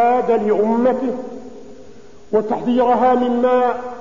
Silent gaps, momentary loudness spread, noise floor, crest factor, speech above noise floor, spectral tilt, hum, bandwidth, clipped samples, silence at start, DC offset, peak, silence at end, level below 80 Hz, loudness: none; 13 LU; -43 dBFS; 14 dB; 26 dB; -7 dB/octave; none; 7.4 kHz; under 0.1%; 0 s; 1%; -4 dBFS; 0 s; -54 dBFS; -17 LUFS